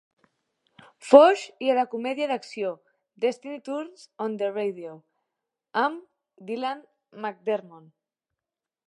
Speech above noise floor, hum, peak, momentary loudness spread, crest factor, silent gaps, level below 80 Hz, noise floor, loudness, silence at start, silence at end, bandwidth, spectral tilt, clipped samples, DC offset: 65 dB; none; 0 dBFS; 23 LU; 26 dB; none; -80 dBFS; -89 dBFS; -25 LUFS; 1.05 s; 1.1 s; 11 kHz; -4.5 dB/octave; under 0.1%; under 0.1%